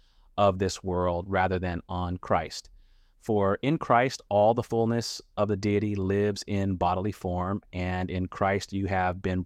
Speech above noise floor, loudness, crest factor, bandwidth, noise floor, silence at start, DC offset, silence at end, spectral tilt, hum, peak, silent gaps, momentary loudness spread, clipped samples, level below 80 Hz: 30 dB; -28 LUFS; 18 dB; 14 kHz; -57 dBFS; 0.35 s; under 0.1%; 0 s; -6 dB/octave; none; -10 dBFS; none; 8 LU; under 0.1%; -52 dBFS